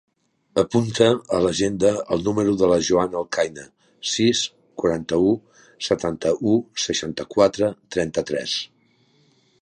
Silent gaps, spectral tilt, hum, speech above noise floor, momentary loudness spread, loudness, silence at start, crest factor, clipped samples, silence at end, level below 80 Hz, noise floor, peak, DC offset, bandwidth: none; -4.5 dB/octave; none; 40 dB; 8 LU; -22 LUFS; 0.55 s; 20 dB; under 0.1%; 0.95 s; -52 dBFS; -60 dBFS; -2 dBFS; under 0.1%; 11 kHz